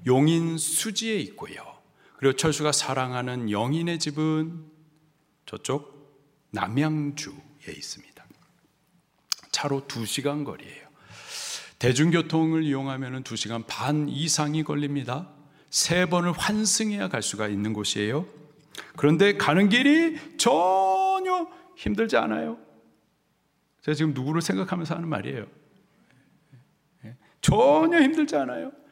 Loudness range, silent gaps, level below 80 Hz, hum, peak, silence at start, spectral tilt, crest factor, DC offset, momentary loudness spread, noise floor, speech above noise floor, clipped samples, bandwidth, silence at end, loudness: 10 LU; none; -56 dBFS; none; -4 dBFS; 0 s; -4.5 dB/octave; 22 dB; under 0.1%; 17 LU; -70 dBFS; 45 dB; under 0.1%; 16 kHz; 0.2 s; -25 LUFS